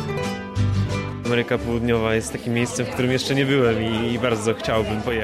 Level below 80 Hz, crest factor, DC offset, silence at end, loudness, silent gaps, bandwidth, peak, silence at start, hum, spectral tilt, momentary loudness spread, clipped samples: -40 dBFS; 14 dB; under 0.1%; 0 s; -22 LUFS; none; 14.5 kHz; -8 dBFS; 0 s; none; -5.5 dB/octave; 6 LU; under 0.1%